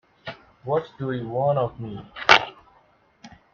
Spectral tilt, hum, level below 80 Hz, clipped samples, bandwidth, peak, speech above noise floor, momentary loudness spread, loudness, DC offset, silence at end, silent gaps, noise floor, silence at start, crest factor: -4.5 dB/octave; none; -58 dBFS; under 0.1%; 8 kHz; 0 dBFS; 34 dB; 23 LU; -22 LUFS; under 0.1%; 0.25 s; none; -59 dBFS; 0.25 s; 26 dB